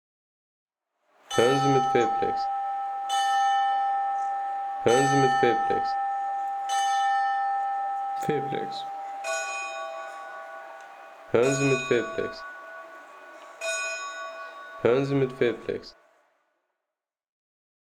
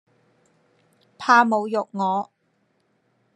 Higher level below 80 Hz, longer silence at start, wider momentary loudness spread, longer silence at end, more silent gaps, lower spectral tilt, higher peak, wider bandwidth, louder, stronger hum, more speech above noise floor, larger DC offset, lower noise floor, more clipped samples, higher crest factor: first, -64 dBFS vs -82 dBFS; about the same, 1.3 s vs 1.2 s; first, 18 LU vs 13 LU; first, 1.95 s vs 1.1 s; neither; about the same, -4.5 dB/octave vs -5 dB/octave; second, -8 dBFS vs -2 dBFS; first, 14.5 kHz vs 10.5 kHz; second, -26 LUFS vs -21 LUFS; neither; first, 64 dB vs 48 dB; neither; first, -88 dBFS vs -68 dBFS; neither; about the same, 18 dB vs 22 dB